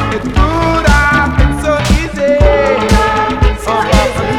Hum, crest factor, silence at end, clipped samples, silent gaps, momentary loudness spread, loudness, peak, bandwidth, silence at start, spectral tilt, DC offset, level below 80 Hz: none; 10 dB; 0 s; 0.3%; none; 4 LU; -11 LUFS; 0 dBFS; 14.5 kHz; 0 s; -5.5 dB/octave; 0.7%; -16 dBFS